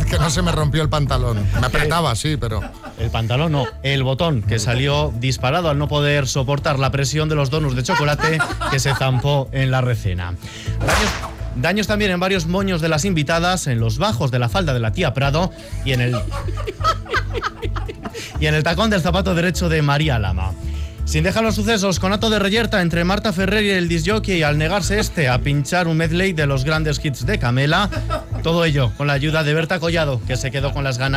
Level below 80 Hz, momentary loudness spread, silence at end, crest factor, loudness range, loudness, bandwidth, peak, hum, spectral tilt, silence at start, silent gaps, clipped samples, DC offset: -30 dBFS; 7 LU; 0 s; 12 dB; 2 LU; -19 LUFS; 15.5 kHz; -6 dBFS; none; -5 dB/octave; 0 s; none; under 0.1%; under 0.1%